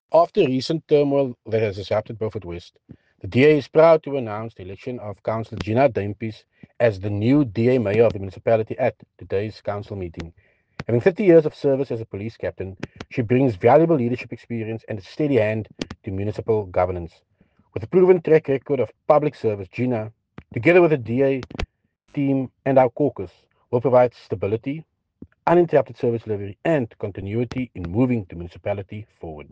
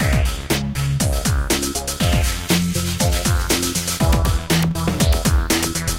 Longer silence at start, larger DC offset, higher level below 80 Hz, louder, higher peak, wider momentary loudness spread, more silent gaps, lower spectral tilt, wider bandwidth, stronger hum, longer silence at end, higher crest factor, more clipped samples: about the same, 0.1 s vs 0 s; neither; second, -50 dBFS vs -24 dBFS; about the same, -21 LUFS vs -19 LUFS; about the same, -4 dBFS vs -4 dBFS; first, 17 LU vs 3 LU; neither; first, -8.5 dB/octave vs -4 dB/octave; second, 8 kHz vs 17 kHz; neither; about the same, 0.1 s vs 0 s; about the same, 18 dB vs 14 dB; neither